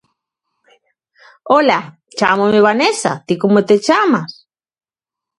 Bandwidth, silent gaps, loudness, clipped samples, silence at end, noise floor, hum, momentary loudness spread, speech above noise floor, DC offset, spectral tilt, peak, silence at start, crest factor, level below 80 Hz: 11.5 kHz; none; -14 LUFS; under 0.1%; 1.05 s; -87 dBFS; none; 8 LU; 73 dB; under 0.1%; -4.5 dB/octave; 0 dBFS; 1.45 s; 16 dB; -60 dBFS